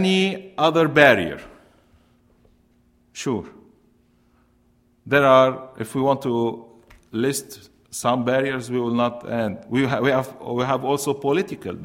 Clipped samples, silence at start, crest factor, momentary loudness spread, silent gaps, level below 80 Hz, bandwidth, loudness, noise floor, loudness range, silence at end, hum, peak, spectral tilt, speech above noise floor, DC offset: under 0.1%; 0 s; 22 dB; 15 LU; none; -58 dBFS; 16 kHz; -21 LUFS; -60 dBFS; 13 LU; 0 s; none; 0 dBFS; -5 dB/octave; 40 dB; under 0.1%